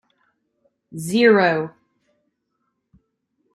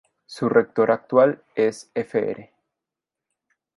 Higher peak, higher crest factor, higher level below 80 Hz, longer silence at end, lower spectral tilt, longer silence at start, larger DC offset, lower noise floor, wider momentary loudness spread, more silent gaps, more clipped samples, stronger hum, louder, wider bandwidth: about the same, -2 dBFS vs -4 dBFS; about the same, 20 dB vs 20 dB; about the same, -68 dBFS vs -70 dBFS; first, 1.85 s vs 1.35 s; about the same, -5.5 dB/octave vs -6.5 dB/octave; first, 0.95 s vs 0.3 s; neither; second, -74 dBFS vs -87 dBFS; first, 19 LU vs 11 LU; neither; neither; neither; first, -17 LUFS vs -22 LUFS; first, 13 kHz vs 11.5 kHz